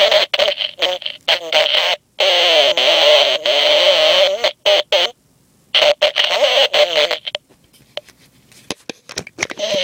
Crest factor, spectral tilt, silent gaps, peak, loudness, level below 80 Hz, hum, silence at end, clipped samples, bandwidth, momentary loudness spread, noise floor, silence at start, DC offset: 16 dB; 0 dB/octave; none; 0 dBFS; -13 LUFS; -62 dBFS; none; 0 s; under 0.1%; 16.5 kHz; 18 LU; -55 dBFS; 0 s; under 0.1%